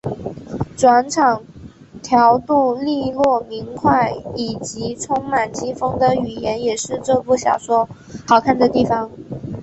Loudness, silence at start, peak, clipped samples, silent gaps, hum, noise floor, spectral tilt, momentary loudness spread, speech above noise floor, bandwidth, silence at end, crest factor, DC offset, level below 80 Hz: -18 LUFS; 0.05 s; -2 dBFS; under 0.1%; none; none; -38 dBFS; -5 dB/octave; 14 LU; 21 dB; 8.4 kHz; 0 s; 16 dB; under 0.1%; -46 dBFS